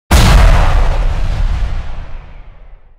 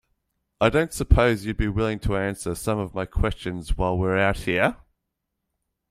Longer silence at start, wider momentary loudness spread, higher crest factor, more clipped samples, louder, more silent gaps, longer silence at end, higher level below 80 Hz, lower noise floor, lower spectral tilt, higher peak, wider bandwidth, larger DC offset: second, 0.1 s vs 0.6 s; first, 20 LU vs 8 LU; second, 10 dB vs 22 dB; neither; first, -13 LUFS vs -24 LUFS; neither; second, 0.25 s vs 1.15 s; first, -12 dBFS vs -32 dBFS; second, -34 dBFS vs -80 dBFS; about the same, -5 dB/octave vs -6 dB/octave; about the same, 0 dBFS vs -2 dBFS; about the same, 16 kHz vs 16 kHz; neither